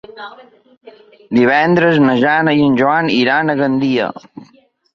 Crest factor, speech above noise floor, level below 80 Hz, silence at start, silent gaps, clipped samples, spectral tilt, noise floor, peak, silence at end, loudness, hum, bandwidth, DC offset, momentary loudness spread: 14 dB; 28 dB; -56 dBFS; 0.1 s; 0.77-0.81 s; under 0.1%; -7 dB/octave; -42 dBFS; 0 dBFS; 0.5 s; -13 LUFS; none; 7 kHz; under 0.1%; 17 LU